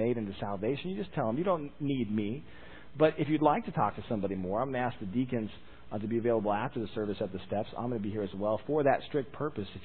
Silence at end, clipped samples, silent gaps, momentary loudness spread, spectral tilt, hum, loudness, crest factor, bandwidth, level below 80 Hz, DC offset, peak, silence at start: 0 s; under 0.1%; none; 9 LU; -11 dB/octave; none; -32 LUFS; 22 dB; 4.5 kHz; -58 dBFS; 0.4%; -10 dBFS; 0 s